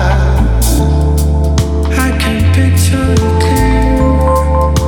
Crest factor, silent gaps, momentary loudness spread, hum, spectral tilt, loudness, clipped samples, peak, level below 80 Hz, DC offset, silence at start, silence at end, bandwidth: 8 dB; none; 2 LU; none; -6 dB/octave; -11 LUFS; under 0.1%; 0 dBFS; -12 dBFS; under 0.1%; 0 s; 0 s; 18.5 kHz